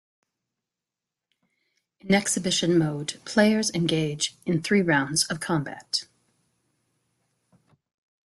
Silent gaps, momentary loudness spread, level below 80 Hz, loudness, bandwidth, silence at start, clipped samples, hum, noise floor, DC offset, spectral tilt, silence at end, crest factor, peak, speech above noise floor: none; 7 LU; -64 dBFS; -24 LUFS; 12.5 kHz; 2.05 s; under 0.1%; none; -88 dBFS; under 0.1%; -4 dB/octave; 2.3 s; 20 dB; -8 dBFS; 64 dB